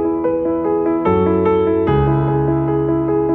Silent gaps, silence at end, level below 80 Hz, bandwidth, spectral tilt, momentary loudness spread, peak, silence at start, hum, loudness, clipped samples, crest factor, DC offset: none; 0 s; -34 dBFS; 3.8 kHz; -11.5 dB/octave; 3 LU; -4 dBFS; 0 s; none; -16 LUFS; under 0.1%; 12 dB; under 0.1%